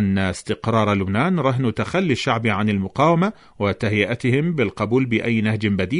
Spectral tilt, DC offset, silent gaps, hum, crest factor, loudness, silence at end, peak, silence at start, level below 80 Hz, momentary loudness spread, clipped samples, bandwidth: -7 dB/octave; under 0.1%; none; none; 16 dB; -20 LUFS; 0 s; -4 dBFS; 0 s; -50 dBFS; 4 LU; under 0.1%; 11 kHz